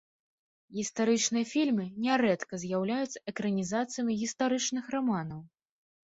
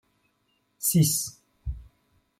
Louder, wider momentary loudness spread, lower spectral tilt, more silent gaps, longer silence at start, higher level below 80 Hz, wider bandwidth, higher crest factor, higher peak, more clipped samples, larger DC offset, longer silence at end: second, -31 LUFS vs -24 LUFS; second, 8 LU vs 19 LU; about the same, -4 dB/octave vs -4.5 dB/octave; neither; about the same, 0.7 s vs 0.8 s; second, -70 dBFS vs -46 dBFS; second, 8 kHz vs 16.5 kHz; about the same, 16 dB vs 18 dB; second, -14 dBFS vs -10 dBFS; neither; neither; about the same, 0.6 s vs 0.55 s